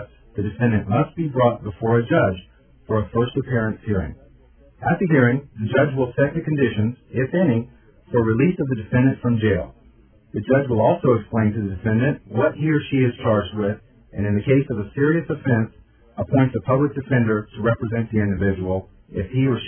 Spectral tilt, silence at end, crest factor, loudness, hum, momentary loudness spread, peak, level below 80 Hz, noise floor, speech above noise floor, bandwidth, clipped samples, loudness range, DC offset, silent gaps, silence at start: -12 dB/octave; 0 s; 18 dB; -21 LUFS; none; 8 LU; -2 dBFS; -46 dBFS; -52 dBFS; 32 dB; 3.5 kHz; under 0.1%; 2 LU; under 0.1%; none; 0 s